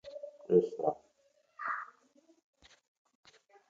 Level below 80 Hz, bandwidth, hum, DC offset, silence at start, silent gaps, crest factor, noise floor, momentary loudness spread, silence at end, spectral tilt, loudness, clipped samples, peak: -80 dBFS; 7.4 kHz; none; under 0.1%; 0.05 s; none; 24 dB; -72 dBFS; 19 LU; 1.8 s; -8 dB/octave; -33 LUFS; under 0.1%; -14 dBFS